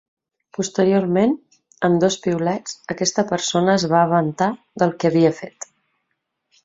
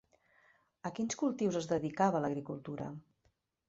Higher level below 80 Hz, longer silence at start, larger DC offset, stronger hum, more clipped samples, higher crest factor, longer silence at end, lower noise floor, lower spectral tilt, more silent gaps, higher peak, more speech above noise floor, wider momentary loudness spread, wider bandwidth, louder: first, -60 dBFS vs -72 dBFS; second, 0.6 s vs 0.85 s; neither; neither; neither; about the same, 18 dB vs 20 dB; first, 1.15 s vs 0.7 s; about the same, -75 dBFS vs -77 dBFS; about the same, -5 dB/octave vs -6 dB/octave; neither; first, -2 dBFS vs -16 dBFS; first, 56 dB vs 42 dB; about the same, 13 LU vs 13 LU; about the same, 8 kHz vs 8 kHz; first, -19 LUFS vs -36 LUFS